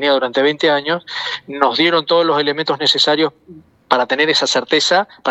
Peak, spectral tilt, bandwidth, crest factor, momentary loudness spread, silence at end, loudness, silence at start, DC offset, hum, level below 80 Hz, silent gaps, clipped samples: 0 dBFS; -3 dB/octave; 8.6 kHz; 16 dB; 8 LU; 0 s; -15 LUFS; 0 s; under 0.1%; none; -66 dBFS; none; under 0.1%